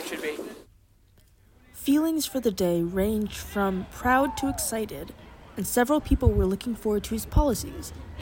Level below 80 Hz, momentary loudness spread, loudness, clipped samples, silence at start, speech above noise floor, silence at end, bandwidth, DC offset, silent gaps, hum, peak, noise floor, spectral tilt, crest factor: -36 dBFS; 14 LU; -26 LUFS; under 0.1%; 0 s; 33 dB; 0 s; 17 kHz; under 0.1%; none; none; -6 dBFS; -58 dBFS; -5 dB/octave; 20 dB